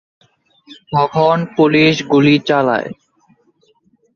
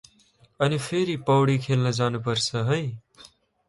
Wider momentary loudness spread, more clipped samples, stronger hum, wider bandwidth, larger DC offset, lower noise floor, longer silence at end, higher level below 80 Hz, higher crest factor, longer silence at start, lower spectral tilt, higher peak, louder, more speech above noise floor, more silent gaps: first, 9 LU vs 6 LU; neither; neither; second, 7 kHz vs 11.5 kHz; neither; about the same, -57 dBFS vs -60 dBFS; first, 1.25 s vs 0.4 s; about the same, -56 dBFS vs -60 dBFS; about the same, 16 dB vs 16 dB; about the same, 0.7 s vs 0.6 s; about the same, -6.5 dB/octave vs -5.5 dB/octave; first, 0 dBFS vs -8 dBFS; first, -13 LUFS vs -24 LUFS; first, 44 dB vs 37 dB; neither